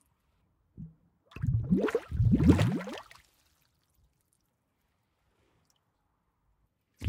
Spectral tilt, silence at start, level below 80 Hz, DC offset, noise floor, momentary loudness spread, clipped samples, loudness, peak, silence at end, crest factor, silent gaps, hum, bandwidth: -8 dB/octave; 0.8 s; -46 dBFS; under 0.1%; -77 dBFS; 26 LU; under 0.1%; -28 LUFS; -8 dBFS; 0 s; 24 dB; none; none; 15 kHz